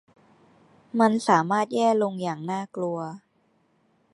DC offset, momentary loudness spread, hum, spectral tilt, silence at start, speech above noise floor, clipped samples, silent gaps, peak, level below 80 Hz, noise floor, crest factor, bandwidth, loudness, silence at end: under 0.1%; 12 LU; none; -6 dB/octave; 0.95 s; 43 dB; under 0.1%; none; -4 dBFS; -78 dBFS; -67 dBFS; 22 dB; 11.5 kHz; -24 LUFS; 0.95 s